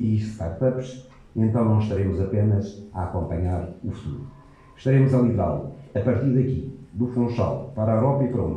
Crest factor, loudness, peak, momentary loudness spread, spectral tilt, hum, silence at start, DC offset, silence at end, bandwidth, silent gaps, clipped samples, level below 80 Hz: 16 dB; -24 LUFS; -6 dBFS; 13 LU; -10 dB/octave; none; 0 s; under 0.1%; 0 s; 7.8 kHz; none; under 0.1%; -44 dBFS